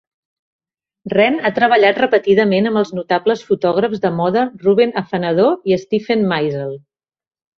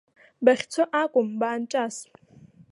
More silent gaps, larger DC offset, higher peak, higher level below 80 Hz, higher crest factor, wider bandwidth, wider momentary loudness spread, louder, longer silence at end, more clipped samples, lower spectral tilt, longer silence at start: neither; neither; about the same, -2 dBFS vs -4 dBFS; first, -58 dBFS vs -76 dBFS; second, 14 dB vs 22 dB; second, 6.6 kHz vs 11.5 kHz; about the same, 7 LU vs 8 LU; first, -16 LUFS vs -24 LUFS; about the same, 0.8 s vs 0.7 s; neither; first, -7 dB/octave vs -4 dB/octave; first, 1.05 s vs 0.4 s